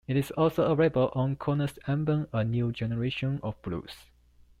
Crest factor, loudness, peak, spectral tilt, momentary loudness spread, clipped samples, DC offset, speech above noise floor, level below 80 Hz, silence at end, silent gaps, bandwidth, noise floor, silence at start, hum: 16 dB; -29 LUFS; -12 dBFS; -8 dB/octave; 12 LU; under 0.1%; under 0.1%; 31 dB; -54 dBFS; 0.6 s; none; 15 kHz; -59 dBFS; 0.1 s; none